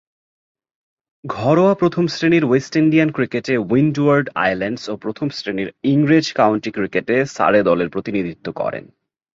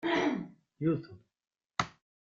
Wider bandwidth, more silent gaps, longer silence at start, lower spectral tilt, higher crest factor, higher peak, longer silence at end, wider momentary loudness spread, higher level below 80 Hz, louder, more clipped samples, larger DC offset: about the same, 7.6 kHz vs 7.6 kHz; neither; first, 1.25 s vs 0 s; about the same, -6.5 dB/octave vs -5.5 dB/octave; second, 16 dB vs 22 dB; first, -2 dBFS vs -14 dBFS; about the same, 0.5 s vs 0.4 s; second, 10 LU vs 15 LU; first, -56 dBFS vs -68 dBFS; first, -18 LUFS vs -34 LUFS; neither; neither